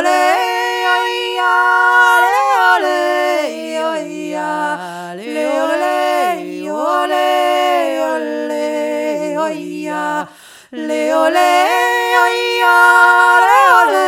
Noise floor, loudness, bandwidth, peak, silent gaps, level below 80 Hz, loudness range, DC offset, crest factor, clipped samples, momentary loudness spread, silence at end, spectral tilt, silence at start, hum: -38 dBFS; -13 LUFS; 18 kHz; 0 dBFS; none; -74 dBFS; 7 LU; under 0.1%; 14 dB; under 0.1%; 13 LU; 0 s; -2.5 dB/octave; 0 s; none